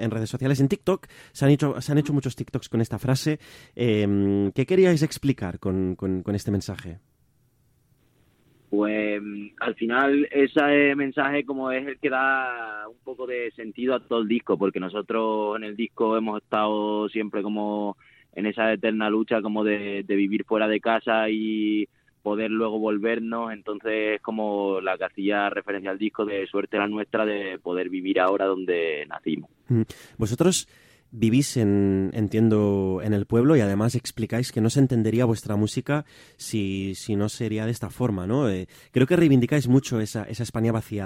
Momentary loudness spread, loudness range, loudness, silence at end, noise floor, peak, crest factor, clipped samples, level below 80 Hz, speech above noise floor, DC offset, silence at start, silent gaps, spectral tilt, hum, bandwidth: 10 LU; 4 LU; -24 LUFS; 0 s; -65 dBFS; -6 dBFS; 18 dB; under 0.1%; -58 dBFS; 41 dB; under 0.1%; 0 s; none; -6 dB/octave; none; 16 kHz